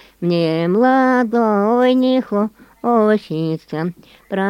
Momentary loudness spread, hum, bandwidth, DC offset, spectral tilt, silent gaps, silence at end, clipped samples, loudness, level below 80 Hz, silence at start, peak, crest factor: 11 LU; none; 10.5 kHz; under 0.1%; -8 dB/octave; none; 0 s; under 0.1%; -17 LUFS; -60 dBFS; 0.2 s; -2 dBFS; 14 dB